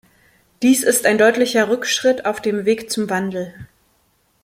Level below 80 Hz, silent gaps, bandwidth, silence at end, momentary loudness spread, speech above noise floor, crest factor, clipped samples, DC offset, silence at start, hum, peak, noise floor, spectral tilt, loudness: -60 dBFS; none; 16.5 kHz; 0.8 s; 8 LU; 45 dB; 18 dB; under 0.1%; under 0.1%; 0.6 s; none; -2 dBFS; -62 dBFS; -3 dB/octave; -17 LUFS